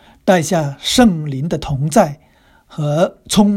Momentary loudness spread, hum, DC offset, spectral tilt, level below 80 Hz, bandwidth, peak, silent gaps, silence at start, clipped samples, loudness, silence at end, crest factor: 9 LU; none; under 0.1%; -5 dB/octave; -40 dBFS; 16.5 kHz; 0 dBFS; none; 0.25 s; under 0.1%; -16 LUFS; 0 s; 16 dB